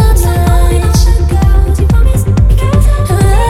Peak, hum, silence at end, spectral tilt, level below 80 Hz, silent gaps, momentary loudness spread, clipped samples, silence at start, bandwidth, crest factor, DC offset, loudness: 0 dBFS; none; 0 s; -6.5 dB/octave; -8 dBFS; none; 1 LU; under 0.1%; 0 s; 15 kHz; 6 dB; under 0.1%; -10 LUFS